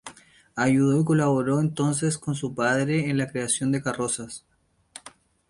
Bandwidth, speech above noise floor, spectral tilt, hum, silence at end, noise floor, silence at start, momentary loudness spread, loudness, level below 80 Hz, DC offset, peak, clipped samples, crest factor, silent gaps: 11.5 kHz; 27 dB; -5.5 dB/octave; none; 0.4 s; -51 dBFS; 0.05 s; 19 LU; -24 LUFS; -60 dBFS; under 0.1%; -10 dBFS; under 0.1%; 16 dB; none